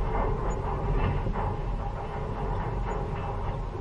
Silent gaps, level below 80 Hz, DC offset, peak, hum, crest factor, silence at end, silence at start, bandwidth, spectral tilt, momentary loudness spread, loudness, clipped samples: none; -32 dBFS; under 0.1%; -14 dBFS; none; 14 dB; 0 s; 0 s; 7.4 kHz; -8 dB/octave; 5 LU; -32 LUFS; under 0.1%